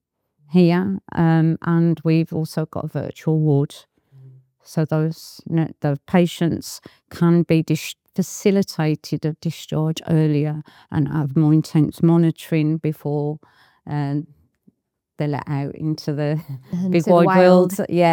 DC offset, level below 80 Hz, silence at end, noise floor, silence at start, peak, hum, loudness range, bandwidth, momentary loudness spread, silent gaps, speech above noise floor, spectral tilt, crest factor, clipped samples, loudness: under 0.1%; -60 dBFS; 0 s; -63 dBFS; 0.5 s; 0 dBFS; none; 6 LU; 17 kHz; 12 LU; none; 44 dB; -7.5 dB/octave; 18 dB; under 0.1%; -20 LUFS